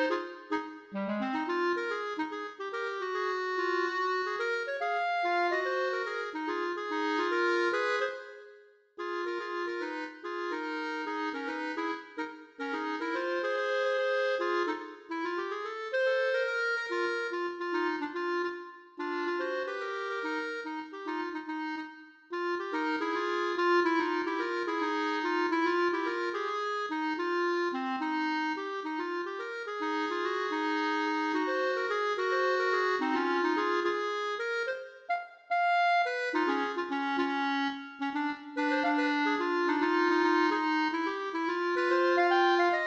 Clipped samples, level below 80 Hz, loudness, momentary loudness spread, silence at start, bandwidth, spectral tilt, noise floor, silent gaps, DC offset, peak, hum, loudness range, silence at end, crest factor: under 0.1%; -82 dBFS; -31 LUFS; 9 LU; 0 s; 8 kHz; -4 dB/octave; -57 dBFS; none; under 0.1%; -16 dBFS; none; 6 LU; 0 s; 16 dB